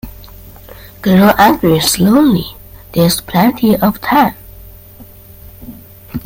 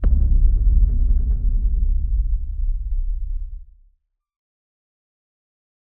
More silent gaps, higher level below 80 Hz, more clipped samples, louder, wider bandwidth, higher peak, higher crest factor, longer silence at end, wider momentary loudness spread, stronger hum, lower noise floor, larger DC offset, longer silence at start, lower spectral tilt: neither; second, -38 dBFS vs -20 dBFS; neither; first, -11 LUFS vs -23 LUFS; first, 17 kHz vs 1.5 kHz; first, 0 dBFS vs -6 dBFS; about the same, 14 dB vs 14 dB; second, 0.05 s vs 2.35 s; first, 19 LU vs 12 LU; neither; second, -37 dBFS vs -62 dBFS; neither; about the same, 0.05 s vs 0 s; second, -5 dB/octave vs -12.5 dB/octave